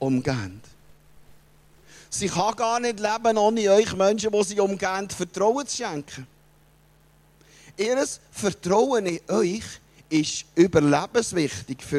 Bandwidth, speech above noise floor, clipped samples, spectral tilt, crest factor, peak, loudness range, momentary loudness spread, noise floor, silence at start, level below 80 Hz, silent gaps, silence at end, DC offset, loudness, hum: 14 kHz; 34 dB; under 0.1%; -4.5 dB/octave; 18 dB; -6 dBFS; 6 LU; 13 LU; -57 dBFS; 0 s; -56 dBFS; none; 0 s; under 0.1%; -24 LUFS; none